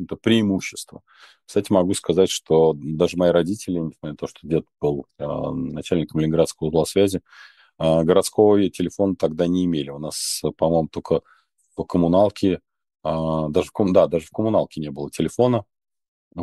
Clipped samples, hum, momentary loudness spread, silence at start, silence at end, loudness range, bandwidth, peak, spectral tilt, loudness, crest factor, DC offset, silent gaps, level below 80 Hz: under 0.1%; none; 12 LU; 0 s; 0 s; 3 LU; 12.5 kHz; -2 dBFS; -6 dB/octave; -21 LUFS; 18 dB; under 0.1%; 16.08-16.31 s; -50 dBFS